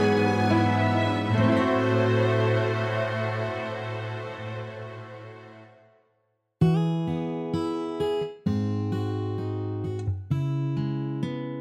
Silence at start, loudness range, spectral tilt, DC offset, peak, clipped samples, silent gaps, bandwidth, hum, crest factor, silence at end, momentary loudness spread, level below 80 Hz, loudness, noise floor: 0 s; 9 LU; -7.5 dB/octave; under 0.1%; -8 dBFS; under 0.1%; none; 9.6 kHz; none; 18 dB; 0 s; 13 LU; -58 dBFS; -26 LUFS; -73 dBFS